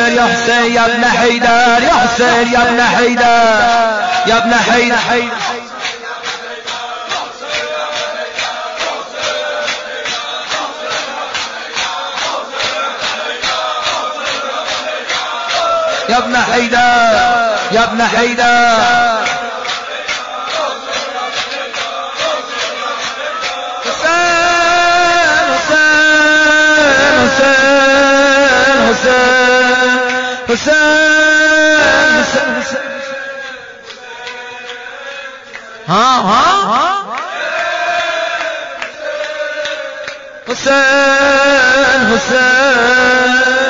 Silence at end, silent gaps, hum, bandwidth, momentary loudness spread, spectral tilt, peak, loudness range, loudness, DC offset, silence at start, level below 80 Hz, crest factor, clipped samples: 0 s; none; none; 7.6 kHz; 13 LU; 0 dB/octave; -2 dBFS; 10 LU; -11 LUFS; under 0.1%; 0 s; -44 dBFS; 10 dB; under 0.1%